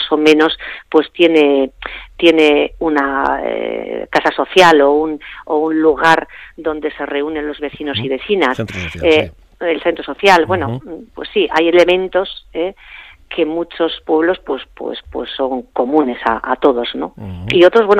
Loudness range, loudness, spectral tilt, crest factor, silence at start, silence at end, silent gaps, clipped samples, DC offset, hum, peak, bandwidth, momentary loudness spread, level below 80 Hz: 5 LU; -15 LUFS; -5 dB/octave; 14 dB; 0 s; 0 s; none; under 0.1%; under 0.1%; none; 0 dBFS; 13 kHz; 14 LU; -44 dBFS